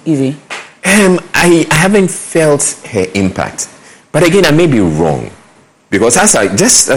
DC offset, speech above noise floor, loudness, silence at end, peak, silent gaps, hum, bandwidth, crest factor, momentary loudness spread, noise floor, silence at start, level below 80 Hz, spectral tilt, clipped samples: under 0.1%; 35 dB; -10 LUFS; 0 s; 0 dBFS; none; none; over 20 kHz; 10 dB; 11 LU; -45 dBFS; 0.05 s; -38 dBFS; -4 dB/octave; 0.1%